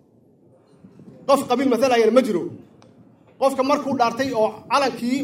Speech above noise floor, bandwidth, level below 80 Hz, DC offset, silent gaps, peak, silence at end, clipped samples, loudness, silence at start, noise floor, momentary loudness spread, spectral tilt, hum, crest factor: 35 dB; 16 kHz; -70 dBFS; under 0.1%; none; -2 dBFS; 0 s; under 0.1%; -20 LUFS; 1.3 s; -55 dBFS; 8 LU; -4.5 dB/octave; none; 18 dB